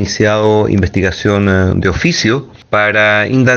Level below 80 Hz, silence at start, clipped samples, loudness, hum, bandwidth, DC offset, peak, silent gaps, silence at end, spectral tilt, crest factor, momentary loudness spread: -36 dBFS; 0 s; under 0.1%; -12 LUFS; none; 7.4 kHz; under 0.1%; 0 dBFS; none; 0 s; -5.5 dB/octave; 12 dB; 5 LU